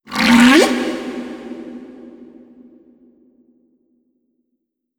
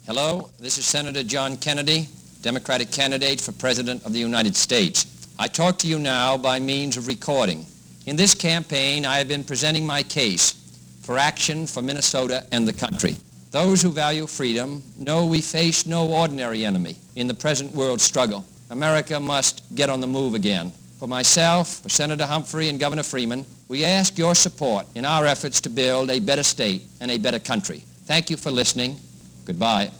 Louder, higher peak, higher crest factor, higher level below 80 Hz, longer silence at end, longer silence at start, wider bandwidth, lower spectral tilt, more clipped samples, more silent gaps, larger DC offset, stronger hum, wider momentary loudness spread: first, -13 LUFS vs -21 LUFS; first, 0 dBFS vs -4 dBFS; about the same, 18 dB vs 18 dB; about the same, -52 dBFS vs -56 dBFS; first, 2.75 s vs 0 s; about the same, 0.1 s vs 0.05 s; about the same, 19.5 kHz vs over 20 kHz; about the same, -3.5 dB/octave vs -3 dB/octave; neither; neither; neither; neither; first, 26 LU vs 10 LU